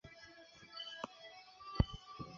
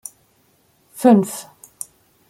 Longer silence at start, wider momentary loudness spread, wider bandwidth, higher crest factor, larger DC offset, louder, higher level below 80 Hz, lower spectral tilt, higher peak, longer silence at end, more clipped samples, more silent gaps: second, 0.05 s vs 1 s; about the same, 18 LU vs 20 LU; second, 7.4 kHz vs 16 kHz; first, 28 dB vs 20 dB; neither; second, -43 LUFS vs -16 LUFS; first, -50 dBFS vs -66 dBFS; about the same, -5 dB/octave vs -6 dB/octave; second, -16 dBFS vs -2 dBFS; second, 0 s vs 0.9 s; neither; neither